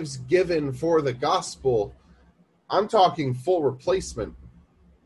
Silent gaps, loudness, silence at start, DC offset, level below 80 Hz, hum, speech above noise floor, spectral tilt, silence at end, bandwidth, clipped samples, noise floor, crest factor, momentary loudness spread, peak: none; -24 LUFS; 0 s; under 0.1%; -50 dBFS; none; 36 dB; -5.5 dB/octave; 0.6 s; 12 kHz; under 0.1%; -59 dBFS; 18 dB; 9 LU; -6 dBFS